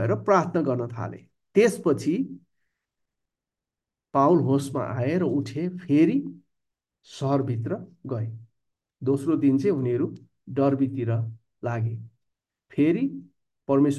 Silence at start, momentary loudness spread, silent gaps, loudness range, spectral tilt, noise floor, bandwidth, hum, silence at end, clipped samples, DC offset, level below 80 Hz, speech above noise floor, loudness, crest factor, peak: 0 s; 14 LU; none; 4 LU; -8 dB/octave; -89 dBFS; 12.5 kHz; none; 0 s; under 0.1%; under 0.1%; -66 dBFS; 65 dB; -25 LUFS; 20 dB; -6 dBFS